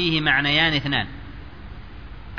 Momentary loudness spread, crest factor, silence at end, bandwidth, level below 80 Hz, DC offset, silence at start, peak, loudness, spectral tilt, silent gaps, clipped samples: 23 LU; 18 dB; 0 s; 5.4 kHz; -40 dBFS; 0.7%; 0 s; -6 dBFS; -19 LUFS; -5.5 dB/octave; none; under 0.1%